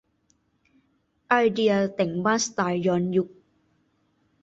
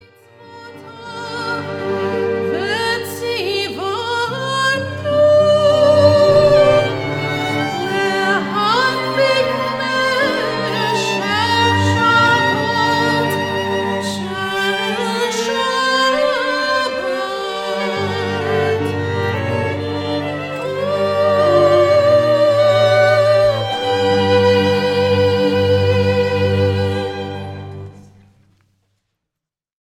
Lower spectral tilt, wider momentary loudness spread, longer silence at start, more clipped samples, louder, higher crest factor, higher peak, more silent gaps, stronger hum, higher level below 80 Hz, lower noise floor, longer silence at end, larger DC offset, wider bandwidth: about the same, -5 dB/octave vs -5 dB/octave; second, 5 LU vs 10 LU; first, 1.3 s vs 0.4 s; neither; second, -24 LUFS vs -16 LUFS; about the same, 20 dB vs 16 dB; second, -6 dBFS vs 0 dBFS; neither; neither; second, -66 dBFS vs -50 dBFS; second, -69 dBFS vs -84 dBFS; second, 1.15 s vs 1.95 s; neither; second, 8 kHz vs 16 kHz